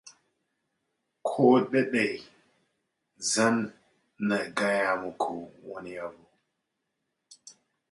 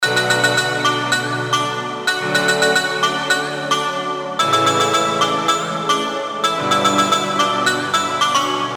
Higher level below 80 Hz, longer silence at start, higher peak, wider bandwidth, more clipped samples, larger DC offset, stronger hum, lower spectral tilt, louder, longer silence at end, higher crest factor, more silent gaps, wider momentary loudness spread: second, -74 dBFS vs -64 dBFS; about the same, 0.05 s vs 0 s; second, -8 dBFS vs -2 dBFS; second, 11.5 kHz vs over 20 kHz; neither; neither; neither; first, -4 dB/octave vs -2.5 dB/octave; second, -27 LUFS vs -17 LUFS; first, 0.4 s vs 0 s; first, 22 dB vs 16 dB; neither; first, 18 LU vs 5 LU